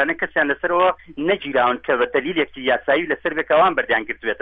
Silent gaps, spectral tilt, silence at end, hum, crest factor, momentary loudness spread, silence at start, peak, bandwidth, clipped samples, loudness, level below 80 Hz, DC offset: none; -8 dB/octave; 0.05 s; none; 14 dB; 6 LU; 0 s; -4 dBFS; 4.9 kHz; under 0.1%; -19 LUFS; -54 dBFS; under 0.1%